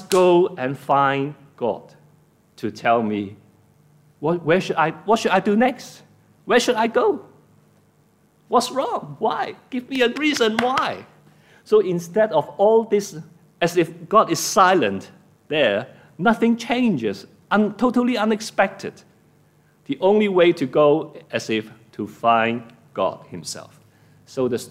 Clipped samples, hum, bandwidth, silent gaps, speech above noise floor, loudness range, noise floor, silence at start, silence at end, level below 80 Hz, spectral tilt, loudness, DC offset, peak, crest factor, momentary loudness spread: under 0.1%; none; 16 kHz; none; 39 dB; 5 LU; -58 dBFS; 0 s; 0 s; -64 dBFS; -4.5 dB/octave; -20 LUFS; under 0.1%; -2 dBFS; 18 dB; 15 LU